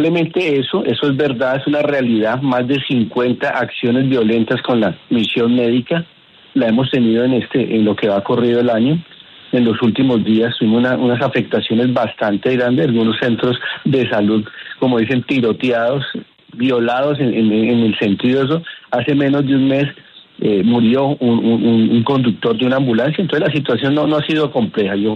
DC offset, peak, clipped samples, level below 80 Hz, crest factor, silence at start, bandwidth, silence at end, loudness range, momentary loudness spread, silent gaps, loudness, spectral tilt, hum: under 0.1%; -2 dBFS; under 0.1%; -56 dBFS; 12 dB; 0 s; 6.2 kHz; 0 s; 2 LU; 4 LU; none; -15 LUFS; -8 dB/octave; none